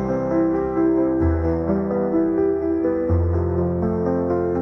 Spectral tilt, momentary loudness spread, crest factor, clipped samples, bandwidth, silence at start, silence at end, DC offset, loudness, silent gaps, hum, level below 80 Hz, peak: -11.5 dB/octave; 3 LU; 12 dB; under 0.1%; 5.8 kHz; 0 s; 0 s; under 0.1%; -21 LUFS; none; none; -38 dBFS; -8 dBFS